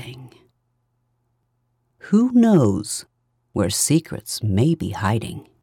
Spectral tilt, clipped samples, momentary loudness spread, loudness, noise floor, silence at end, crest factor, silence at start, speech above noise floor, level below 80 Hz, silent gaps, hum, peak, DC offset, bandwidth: -5.5 dB/octave; under 0.1%; 14 LU; -20 LUFS; -70 dBFS; 0.2 s; 16 dB; 0 s; 51 dB; -58 dBFS; none; none; -6 dBFS; under 0.1%; 18 kHz